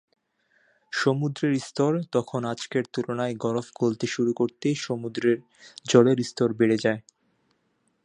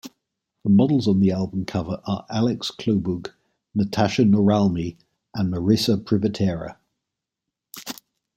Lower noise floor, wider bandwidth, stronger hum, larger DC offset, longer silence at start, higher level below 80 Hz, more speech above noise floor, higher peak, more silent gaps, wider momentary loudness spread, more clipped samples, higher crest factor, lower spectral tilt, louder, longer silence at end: second, -71 dBFS vs -84 dBFS; second, 10.5 kHz vs 16.5 kHz; neither; neither; first, 0.9 s vs 0.05 s; second, -70 dBFS vs -54 dBFS; second, 46 dB vs 64 dB; about the same, -4 dBFS vs -4 dBFS; neither; second, 8 LU vs 17 LU; neither; about the same, 22 dB vs 18 dB; about the same, -6 dB/octave vs -7 dB/octave; second, -25 LUFS vs -22 LUFS; first, 1.05 s vs 0.45 s